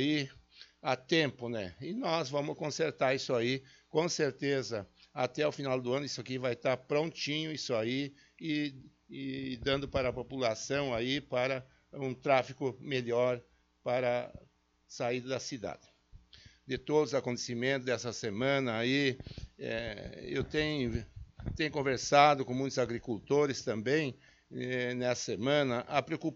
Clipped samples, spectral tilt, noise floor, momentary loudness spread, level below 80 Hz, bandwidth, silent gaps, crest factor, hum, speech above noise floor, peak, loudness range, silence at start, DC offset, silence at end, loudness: under 0.1%; -3.5 dB/octave; -59 dBFS; 11 LU; -58 dBFS; 8 kHz; none; 24 dB; none; 26 dB; -10 dBFS; 5 LU; 0 s; under 0.1%; 0 s; -33 LUFS